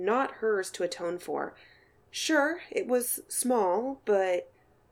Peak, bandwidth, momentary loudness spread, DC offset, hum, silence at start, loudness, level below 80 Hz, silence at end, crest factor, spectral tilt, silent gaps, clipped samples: -12 dBFS; 18.5 kHz; 9 LU; under 0.1%; none; 0 s; -29 LUFS; -72 dBFS; 0.45 s; 18 dB; -2.5 dB/octave; none; under 0.1%